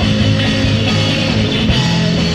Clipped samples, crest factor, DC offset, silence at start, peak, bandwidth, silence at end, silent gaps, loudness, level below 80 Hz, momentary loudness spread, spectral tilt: under 0.1%; 12 dB; under 0.1%; 0 s; -2 dBFS; 11 kHz; 0 s; none; -13 LUFS; -26 dBFS; 1 LU; -5.5 dB/octave